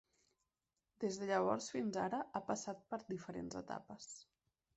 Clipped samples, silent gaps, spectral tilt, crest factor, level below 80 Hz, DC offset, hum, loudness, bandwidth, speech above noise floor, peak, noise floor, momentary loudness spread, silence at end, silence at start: under 0.1%; none; -4.5 dB/octave; 22 dB; -78 dBFS; under 0.1%; none; -42 LUFS; 8.2 kHz; over 48 dB; -22 dBFS; under -90 dBFS; 14 LU; 0.55 s; 1 s